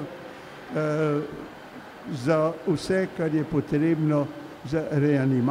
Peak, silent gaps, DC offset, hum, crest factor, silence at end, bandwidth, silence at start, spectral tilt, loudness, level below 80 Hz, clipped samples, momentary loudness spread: -8 dBFS; none; under 0.1%; none; 16 dB; 0 s; 13.5 kHz; 0 s; -7.5 dB/octave; -25 LUFS; -56 dBFS; under 0.1%; 18 LU